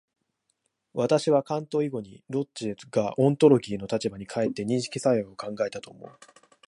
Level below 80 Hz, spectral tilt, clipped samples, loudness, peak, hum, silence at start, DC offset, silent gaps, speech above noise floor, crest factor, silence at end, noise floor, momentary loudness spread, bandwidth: -66 dBFS; -6.5 dB/octave; under 0.1%; -26 LUFS; -6 dBFS; none; 0.95 s; under 0.1%; none; 51 dB; 22 dB; 0.55 s; -77 dBFS; 14 LU; 11.5 kHz